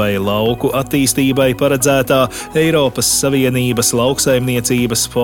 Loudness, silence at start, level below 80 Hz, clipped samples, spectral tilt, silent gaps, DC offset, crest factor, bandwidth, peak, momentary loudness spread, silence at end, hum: -14 LUFS; 0 s; -38 dBFS; under 0.1%; -4 dB/octave; none; under 0.1%; 14 dB; 17.5 kHz; 0 dBFS; 3 LU; 0 s; none